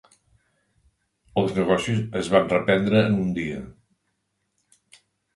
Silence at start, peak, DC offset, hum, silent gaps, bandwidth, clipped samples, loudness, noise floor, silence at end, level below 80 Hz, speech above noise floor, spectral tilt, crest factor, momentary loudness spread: 1.35 s; -2 dBFS; under 0.1%; none; none; 11.5 kHz; under 0.1%; -22 LUFS; -75 dBFS; 1.65 s; -54 dBFS; 53 dB; -6.5 dB/octave; 22 dB; 10 LU